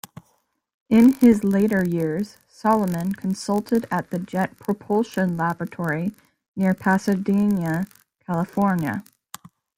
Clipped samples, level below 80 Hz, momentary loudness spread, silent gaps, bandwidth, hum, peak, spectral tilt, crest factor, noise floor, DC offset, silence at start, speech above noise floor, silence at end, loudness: under 0.1%; -58 dBFS; 13 LU; 6.48-6.54 s; 16.5 kHz; none; -4 dBFS; -7.5 dB/octave; 18 dB; -67 dBFS; under 0.1%; 0.9 s; 46 dB; 0.75 s; -22 LUFS